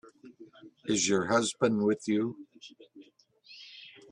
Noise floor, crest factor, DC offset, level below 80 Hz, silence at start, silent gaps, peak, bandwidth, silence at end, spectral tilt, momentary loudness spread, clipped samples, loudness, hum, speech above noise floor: -60 dBFS; 20 dB; under 0.1%; -72 dBFS; 0.25 s; none; -12 dBFS; 11 kHz; 0.2 s; -4 dB/octave; 23 LU; under 0.1%; -29 LUFS; none; 32 dB